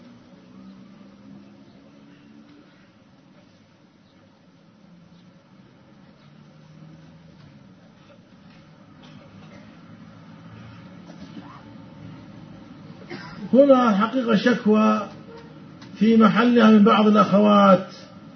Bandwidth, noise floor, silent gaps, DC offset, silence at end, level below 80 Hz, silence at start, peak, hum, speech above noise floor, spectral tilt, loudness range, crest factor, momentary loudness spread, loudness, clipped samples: 6.4 kHz; -54 dBFS; none; under 0.1%; 0.4 s; -66 dBFS; 11.2 s; -2 dBFS; none; 38 dB; -7.5 dB/octave; 26 LU; 20 dB; 29 LU; -17 LUFS; under 0.1%